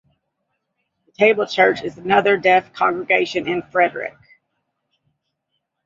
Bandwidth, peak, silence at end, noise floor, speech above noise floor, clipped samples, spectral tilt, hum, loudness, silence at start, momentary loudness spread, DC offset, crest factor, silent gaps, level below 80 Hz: 7.6 kHz; -2 dBFS; 1.75 s; -75 dBFS; 58 dB; under 0.1%; -5 dB/octave; none; -17 LUFS; 1.2 s; 8 LU; under 0.1%; 20 dB; none; -64 dBFS